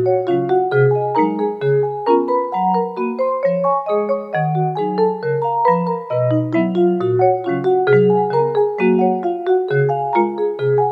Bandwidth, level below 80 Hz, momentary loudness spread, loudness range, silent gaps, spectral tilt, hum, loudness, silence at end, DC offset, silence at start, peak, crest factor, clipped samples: 5.2 kHz; -64 dBFS; 4 LU; 2 LU; none; -10 dB/octave; none; -17 LUFS; 0 s; under 0.1%; 0 s; -2 dBFS; 14 dB; under 0.1%